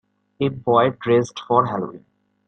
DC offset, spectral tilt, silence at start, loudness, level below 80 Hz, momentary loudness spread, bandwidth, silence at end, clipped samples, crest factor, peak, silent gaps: under 0.1%; -6.5 dB/octave; 0.4 s; -20 LUFS; -60 dBFS; 8 LU; 8.8 kHz; 0.5 s; under 0.1%; 18 dB; -2 dBFS; none